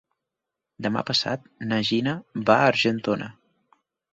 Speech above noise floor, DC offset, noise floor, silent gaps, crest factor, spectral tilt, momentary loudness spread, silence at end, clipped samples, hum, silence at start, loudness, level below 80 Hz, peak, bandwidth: 62 dB; under 0.1%; -85 dBFS; none; 22 dB; -5 dB/octave; 12 LU; 0.8 s; under 0.1%; none; 0.8 s; -24 LUFS; -64 dBFS; -4 dBFS; 8 kHz